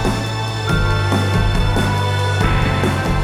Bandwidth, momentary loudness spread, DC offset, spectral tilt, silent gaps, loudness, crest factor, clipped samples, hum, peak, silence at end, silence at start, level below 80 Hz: 14 kHz; 3 LU; 0.2%; -5.5 dB/octave; none; -17 LUFS; 12 dB; under 0.1%; none; -4 dBFS; 0 s; 0 s; -24 dBFS